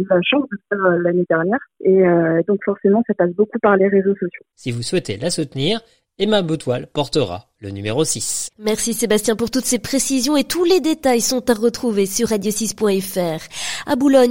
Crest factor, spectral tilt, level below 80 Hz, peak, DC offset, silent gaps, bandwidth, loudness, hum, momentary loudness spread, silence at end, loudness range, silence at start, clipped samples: 16 dB; -4.5 dB/octave; -52 dBFS; -2 dBFS; 0.6%; none; 16.5 kHz; -18 LUFS; none; 9 LU; 0 s; 4 LU; 0 s; under 0.1%